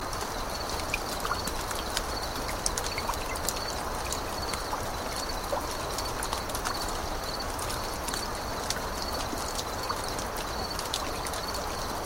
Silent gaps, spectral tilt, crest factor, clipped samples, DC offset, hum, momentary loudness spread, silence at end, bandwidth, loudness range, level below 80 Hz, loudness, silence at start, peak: none; -2.5 dB/octave; 26 dB; under 0.1%; under 0.1%; none; 2 LU; 0 s; 16.5 kHz; 1 LU; -40 dBFS; -32 LUFS; 0 s; -6 dBFS